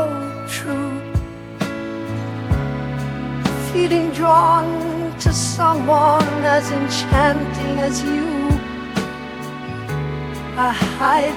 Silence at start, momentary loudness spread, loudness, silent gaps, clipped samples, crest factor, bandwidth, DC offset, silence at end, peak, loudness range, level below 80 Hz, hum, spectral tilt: 0 s; 12 LU; -19 LUFS; none; under 0.1%; 18 dB; 19 kHz; under 0.1%; 0 s; -2 dBFS; 7 LU; -34 dBFS; none; -5.5 dB/octave